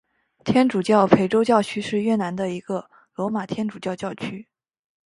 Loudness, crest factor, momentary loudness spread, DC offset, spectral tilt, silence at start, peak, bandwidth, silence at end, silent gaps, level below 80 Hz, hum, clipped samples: -22 LUFS; 22 dB; 15 LU; under 0.1%; -6.5 dB/octave; 0.45 s; 0 dBFS; 11.5 kHz; 0.65 s; none; -60 dBFS; none; under 0.1%